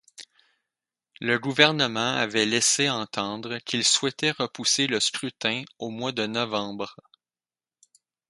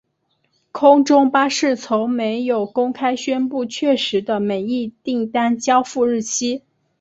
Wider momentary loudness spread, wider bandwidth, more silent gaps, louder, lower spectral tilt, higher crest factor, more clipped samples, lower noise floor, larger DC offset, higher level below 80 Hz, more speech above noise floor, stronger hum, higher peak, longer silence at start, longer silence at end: about the same, 12 LU vs 10 LU; first, 11.5 kHz vs 8 kHz; neither; second, -24 LUFS vs -18 LUFS; second, -2 dB/octave vs -3.5 dB/octave; first, 28 dB vs 16 dB; neither; first, under -90 dBFS vs -68 dBFS; neither; second, -70 dBFS vs -64 dBFS; first, over 64 dB vs 50 dB; neither; about the same, 0 dBFS vs -2 dBFS; second, 0.2 s vs 0.75 s; first, 1.35 s vs 0.4 s